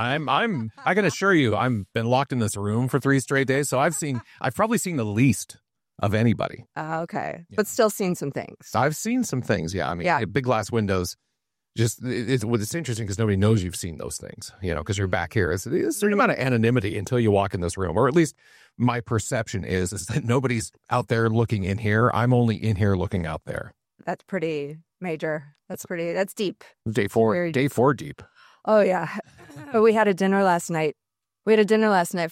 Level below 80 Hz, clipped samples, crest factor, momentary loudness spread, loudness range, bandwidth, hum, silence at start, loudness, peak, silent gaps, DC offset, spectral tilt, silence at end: -52 dBFS; under 0.1%; 16 dB; 12 LU; 4 LU; 16 kHz; none; 0 s; -24 LUFS; -8 dBFS; none; under 0.1%; -5.5 dB/octave; 0 s